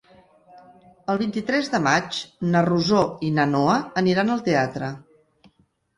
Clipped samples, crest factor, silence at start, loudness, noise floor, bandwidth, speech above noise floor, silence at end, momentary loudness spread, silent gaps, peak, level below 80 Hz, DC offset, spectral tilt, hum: under 0.1%; 18 dB; 0.55 s; -22 LUFS; -63 dBFS; 11.5 kHz; 41 dB; 0.95 s; 10 LU; none; -6 dBFS; -58 dBFS; under 0.1%; -5.5 dB/octave; none